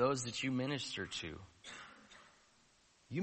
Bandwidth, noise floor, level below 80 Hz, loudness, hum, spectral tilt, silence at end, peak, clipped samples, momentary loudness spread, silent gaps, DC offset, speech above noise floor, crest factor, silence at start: 8.4 kHz; -70 dBFS; -70 dBFS; -40 LUFS; none; -4.5 dB/octave; 0 s; -20 dBFS; under 0.1%; 21 LU; none; under 0.1%; 29 dB; 20 dB; 0 s